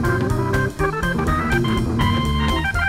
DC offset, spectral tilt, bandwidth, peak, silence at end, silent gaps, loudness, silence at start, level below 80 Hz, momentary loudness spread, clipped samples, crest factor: 0.4%; -6 dB/octave; 16 kHz; -6 dBFS; 0 s; none; -20 LUFS; 0 s; -28 dBFS; 2 LU; under 0.1%; 14 dB